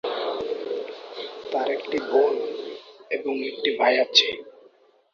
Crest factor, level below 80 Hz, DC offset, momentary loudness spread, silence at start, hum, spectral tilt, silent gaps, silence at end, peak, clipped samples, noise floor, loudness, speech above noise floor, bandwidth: 22 dB; -70 dBFS; under 0.1%; 17 LU; 0.05 s; none; -1.5 dB/octave; none; 0.6 s; -2 dBFS; under 0.1%; -57 dBFS; -24 LUFS; 34 dB; 7.2 kHz